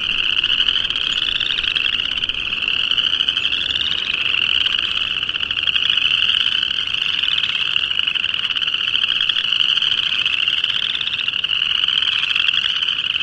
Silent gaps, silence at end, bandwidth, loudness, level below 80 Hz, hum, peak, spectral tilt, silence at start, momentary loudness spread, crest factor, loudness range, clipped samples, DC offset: none; 0 s; 11 kHz; -16 LUFS; -48 dBFS; none; -2 dBFS; -0.5 dB/octave; 0 s; 4 LU; 18 dB; 1 LU; under 0.1%; under 0.1%